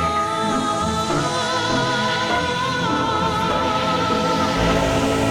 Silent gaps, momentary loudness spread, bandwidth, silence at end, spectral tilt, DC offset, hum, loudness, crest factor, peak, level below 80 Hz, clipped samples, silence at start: none; 2 LU; 18 kHz; 0 s; -4.5 dB/octave; under 0.1%; none; -20 LUFS; 14 dB; -6 dBFS; -38 dBFS; under 0.1%; 0 s